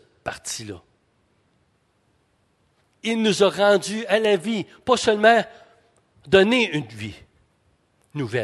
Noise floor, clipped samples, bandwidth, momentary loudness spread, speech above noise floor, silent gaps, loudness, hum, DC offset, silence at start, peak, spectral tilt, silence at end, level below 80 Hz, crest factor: -66 dBFS; under 0.1%; 12.5 kHz; 19 LU; 45 dB; none; -20 LUFS; none; under 0.1%; 0.25 s; -2 dBFS; -4 dB/octave; 0 s; -58 dBFS; 22 dB